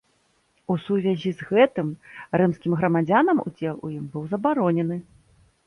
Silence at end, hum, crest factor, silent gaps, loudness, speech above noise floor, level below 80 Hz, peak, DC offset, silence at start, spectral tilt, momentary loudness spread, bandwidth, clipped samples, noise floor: 0.65 s; none; 18 dB; none; -23 LUFS; 43 dB; -62 dBFS; -6 dBFS; under 0.1%; 0.7 s; -8.5 dB/octave; 13 LU; 10.5 kHz; under 0.1%; -66 dBFS